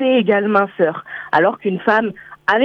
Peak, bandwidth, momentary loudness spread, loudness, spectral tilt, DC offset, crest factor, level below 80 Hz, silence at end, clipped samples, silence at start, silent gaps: -2 dBFS; 6.8 kHz; 7 LU; -17 LUFS; -7.5 dB/octave; under 0.1%; 16 dB; -60 dBFS; 0 s; under 0.1%; 0 s; none